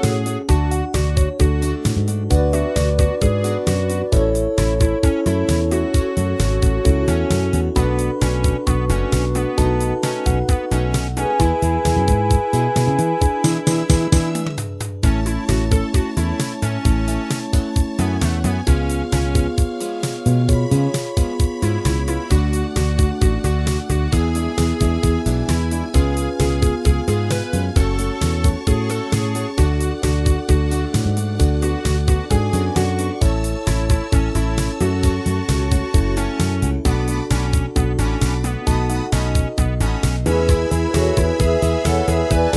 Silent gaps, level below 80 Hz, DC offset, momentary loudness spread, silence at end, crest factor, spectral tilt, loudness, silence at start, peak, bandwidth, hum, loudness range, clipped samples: none; -22 dBFS; 0.1%; 3 LU; 0 s; 16 dB; -6 dB/octave; -19 LUFS; 0 s; 0 dBFS; 11 kHz; none; 2 LU; under 0.1%